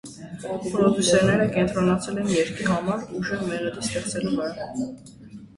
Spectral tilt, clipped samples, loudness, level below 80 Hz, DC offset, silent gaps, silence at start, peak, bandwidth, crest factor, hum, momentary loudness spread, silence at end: -5 dB/octave; under 0.1%; -24 LUFS; -52 dBFS; under 0.1%; none; 0.05 s; -6 dBFS; 11.5 kHz; 18 dB; none; 15 LU; 0.1 s